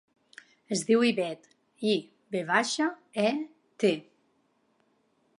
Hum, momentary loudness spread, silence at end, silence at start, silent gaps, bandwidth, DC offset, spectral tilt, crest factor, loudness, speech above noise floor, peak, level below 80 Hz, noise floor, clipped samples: none; 12 LU; 1.4 s; 0.7 s; none; 11.5 kHz; under 0.1%; -4 dB/octave; 22 dB; -28 LUFS; 44 dB; -10 dBFS; -84 dBFS; -71 dBFS; under 0.1%